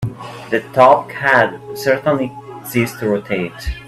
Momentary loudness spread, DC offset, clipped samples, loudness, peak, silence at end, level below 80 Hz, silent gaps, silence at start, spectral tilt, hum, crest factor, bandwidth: 14 LU; under 0.1%; under 0.1%; -16 LUFS; 0 dBFS; 0 s; -38 dBFS; none; 0 s; -5.5 dB/octave; none; 16 dB; 15.5 kHz